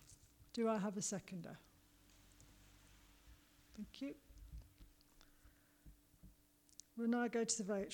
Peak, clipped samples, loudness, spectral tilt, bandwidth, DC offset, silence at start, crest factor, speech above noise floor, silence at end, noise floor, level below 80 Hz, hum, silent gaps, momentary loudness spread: -24 dBFS; under 0.1%; -43 LUFS; -4 dB/octave; 19 kHz; under 0.1%; 0 s; 24 dB; 29 dB; 0 s; -71 dBFS; -68 dBFS; none; none; 27 LU